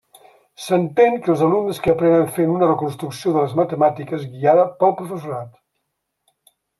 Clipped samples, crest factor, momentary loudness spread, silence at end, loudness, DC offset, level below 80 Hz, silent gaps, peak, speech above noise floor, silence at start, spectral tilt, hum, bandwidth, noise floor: under 0.1%; 16 dB; 13 LU; 1.3 s; -18 LUFS; under 0.1%; -56 dBFS; none; -2 dBFS; 58 dB; 0.6 s; -7 dB/octave; none; 13.5 kHz; -75 dBFS